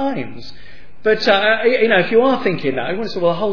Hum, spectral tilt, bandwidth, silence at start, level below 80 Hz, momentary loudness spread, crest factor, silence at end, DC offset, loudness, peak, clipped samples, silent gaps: none; -6 dB/octave; 5.4 kHz; 0 s; -52 dBFS; 10 LU; 16 dB; 0 s; 4%; -16 LUFS; 0 dBFS; under 0.1%; none